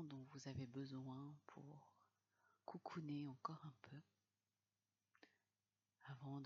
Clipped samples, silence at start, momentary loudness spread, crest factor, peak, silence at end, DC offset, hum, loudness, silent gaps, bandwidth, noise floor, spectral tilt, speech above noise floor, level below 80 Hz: under 0.1%; 0 s; 13 LU; 24 dB; -32 dBFS; 0 s; under 0.1%; none; -55 LUFS; none; 7 kHz; under -90 dBFS; -6.5 dB/octave; over 36 dB; -88 dBFS